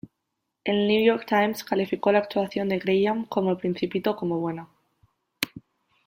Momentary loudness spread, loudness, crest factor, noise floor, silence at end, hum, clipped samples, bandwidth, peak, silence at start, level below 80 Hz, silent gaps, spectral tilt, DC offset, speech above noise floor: 10 LU; -25 LUFS; 22 dB; -80 dBFS; 0.45 s; none; under 0.1%; 16.5 kHz; -4 dBFS; 0.65 s; -66 dBFS; none; -6 dB/octave; under 0.1%; 56 dB